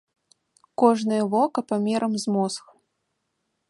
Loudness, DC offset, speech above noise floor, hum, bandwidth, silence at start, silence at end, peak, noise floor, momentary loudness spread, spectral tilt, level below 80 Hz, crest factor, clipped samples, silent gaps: -23 LUFS; under 0.1%; 54 dB; none; 11.5 kHz; 0.8 s; 1.1 s; -4 dBFS; -77 dBFS; 8 LU; -5.5 dB/octave; -74 dBFS; 22 dB; under 0.1%; none